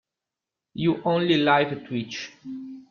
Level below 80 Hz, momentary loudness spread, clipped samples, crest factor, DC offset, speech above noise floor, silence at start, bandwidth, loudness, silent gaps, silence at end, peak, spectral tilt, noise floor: -64 dBFS; 19 LU; under 0.1%; 20 dB; under 0.1%; 64 dB; 0.75 s; 7 kHz; -23 LUFS; none; 0.1 s; -6 dBFS; -6 dB/octave; -87 dBFS